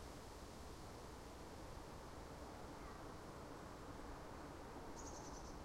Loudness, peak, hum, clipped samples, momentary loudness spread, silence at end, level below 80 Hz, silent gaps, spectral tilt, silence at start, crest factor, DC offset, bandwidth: -55 LUFS; -40 dBFS; none; under 0.1%; 3 LU; 0 s; -60 dBFS; none; -4.5 dB/octave; 0 s; 12 dB; under 0.1%; 16 kHz